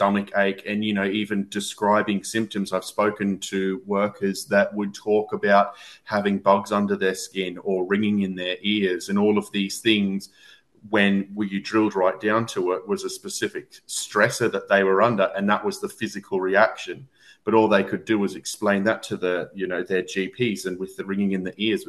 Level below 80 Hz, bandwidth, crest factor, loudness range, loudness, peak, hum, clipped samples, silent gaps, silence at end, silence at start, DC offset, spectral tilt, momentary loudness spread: -66 dBFS; 12.5 kHz; 20 dB; 2 LU; -23 LUFS; -4 dBFS; none; under 0.1%; none; 0.05 s; 0 s; under 0.1%; -5 dB/octave; 9 LU